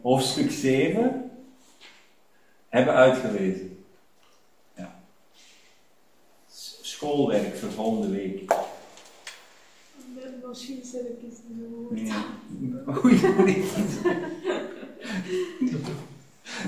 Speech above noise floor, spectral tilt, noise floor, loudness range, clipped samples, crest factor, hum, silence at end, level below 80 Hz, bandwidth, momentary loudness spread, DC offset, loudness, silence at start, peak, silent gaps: 38 dB; -5.5 dB/octave; -63 dBFS; 12 LU; under 0.1%; 22 dB; none; 0 s; -62 dBFS; 16 kHz; 23 LU; 0.1%; -25 LUFS; 0.05 s; -4 dBFS; none